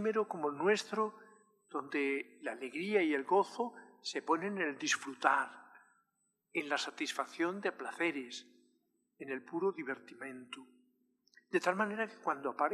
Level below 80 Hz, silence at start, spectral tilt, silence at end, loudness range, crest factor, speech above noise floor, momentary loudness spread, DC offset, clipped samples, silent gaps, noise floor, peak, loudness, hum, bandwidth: under -90 dBFS; 0 s; -3.5 dB/octave; 0 s; 6 LU; 26 dB; 46 dB; 13 LU; under 0.1%; under 0.1%; none; -82 dBFS; -12 dBFS; -36 LUFS; none; 13 kHz